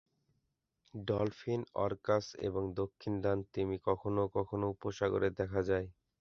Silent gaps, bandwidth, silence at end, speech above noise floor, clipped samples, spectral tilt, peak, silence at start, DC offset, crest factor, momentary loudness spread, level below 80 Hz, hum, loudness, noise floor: none; 7.2 kHz; 0.3 s; 47 dB; under 0.1%; -6.5 dB/octave; -16 dBFS; 0.95 s; under 0.1%; 20 dB; 5 LU; -58 dBFS; none; -36 LUFS; -82 dBFS